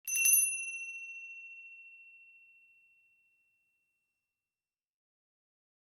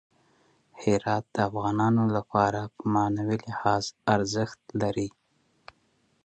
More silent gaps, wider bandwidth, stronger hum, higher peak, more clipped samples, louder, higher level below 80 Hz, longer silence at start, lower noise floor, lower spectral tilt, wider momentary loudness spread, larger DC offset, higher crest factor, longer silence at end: neither; first, 18 kHz vs 8.8 kHz; neither; second, -12 dBFS vs -8 dBFS; neither; about the same, -28 LUFS vs -27 LUFS; second, under -90 dBFS vs -58 dBFS; second, 0.05 s vs 0.75 s; first, under -90 dBFS vs -69 dBFS; second, 7.5 dB/octave vs -6 dB/octave; first, 26 LU vs 7 LU; neither; first, 26 dB vs 20 dB; first, 3.75 s vs 1.15 s